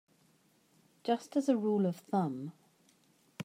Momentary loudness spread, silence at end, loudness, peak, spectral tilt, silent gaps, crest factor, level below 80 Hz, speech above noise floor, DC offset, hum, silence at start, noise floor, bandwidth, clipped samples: 14 LU; 0 s; -33 LUFS; -16 dBFS; -7.5 dB/octave; none; 18 dB; -90 dBFS; 37 dB; under 0.1%; none; 1.05 s; -69 dBFS; 16 kHz; under 0.1%